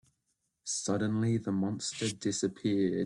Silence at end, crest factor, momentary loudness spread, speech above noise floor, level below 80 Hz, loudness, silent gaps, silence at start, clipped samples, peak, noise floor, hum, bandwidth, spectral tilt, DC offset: 0 s; 14 dB; 4 LU; 49 dB; -68 dBFS; -32 LUFS; none; 0.65 s; under 0.1%; -18 dBFS; -81 dBFS; none; 11.5 kHz; -5 dB/octave; under 0.1%